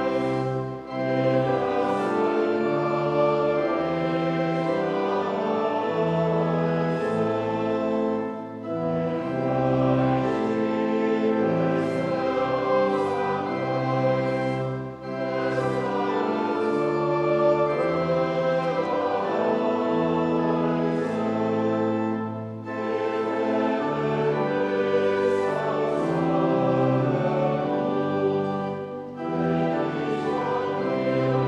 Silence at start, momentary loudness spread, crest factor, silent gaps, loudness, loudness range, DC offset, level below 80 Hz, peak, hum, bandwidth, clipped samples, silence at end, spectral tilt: 0 s; 5 LU; 14 dB; none; -25 LUFS; 2 LU; under 0.1%; -58 dBFS; -10 dBFS; none; 9.8 kHz; under 0.1%; 0 s; -8 dB/octave